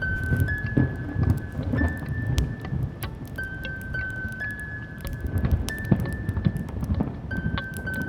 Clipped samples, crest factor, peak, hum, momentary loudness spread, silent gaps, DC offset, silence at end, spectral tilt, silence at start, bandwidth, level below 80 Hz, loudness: under 0.1%; 24 dB; -4 dBFS; none; 8 LU; none; under 0.1%; 0 s; -7 dB/octave; 0 s; 18 kHz; -34 dBFS; -28 LUFS